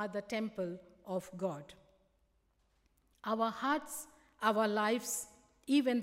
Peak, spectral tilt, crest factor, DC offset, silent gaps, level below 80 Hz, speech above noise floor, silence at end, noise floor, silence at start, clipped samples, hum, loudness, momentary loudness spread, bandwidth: -16 dBFS; -4 dB/octave; 20 dB; under 0.1%; none; -74 dBFS; 40 dB; 0 s; -75 dBFS; 0 s; under 0.1%; none; -36 LUFS; 16 LU; 16 kHz